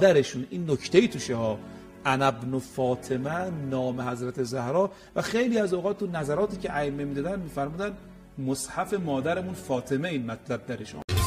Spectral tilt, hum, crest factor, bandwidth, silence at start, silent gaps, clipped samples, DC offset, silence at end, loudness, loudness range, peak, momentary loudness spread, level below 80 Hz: -5.5 dB/octave; none; 22 dB; 15.5 kHz; 0 s; 11.04-11.08 s; under 0.1%; under 0.1%; 0 s; -28 LUFS; 3 LU; -6 dBFS; 9 LU; -50 dBFS